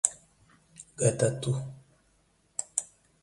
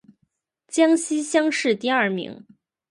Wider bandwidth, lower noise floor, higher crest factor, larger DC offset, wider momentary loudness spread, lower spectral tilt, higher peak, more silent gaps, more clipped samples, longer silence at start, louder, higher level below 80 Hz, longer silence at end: about the same, 11.5 kHz vs 11.5 kHz; about the same, -68 dBFS vs -71 dBFS; first, 30 dB vs 18 dB; neither; first, 24 LU vs 10 LU; about the same, -4.5 dB/octave vs -3.5 dB/octave; first, -2 dBFS vs -6 dBFS; neither; neither; second, 0.05 s vs 0.7 s; second, -30 LUFS vs -21 LUFS; first, -64 dBFS vs -74 dBFS; second, 0.4 s vs 0.55 s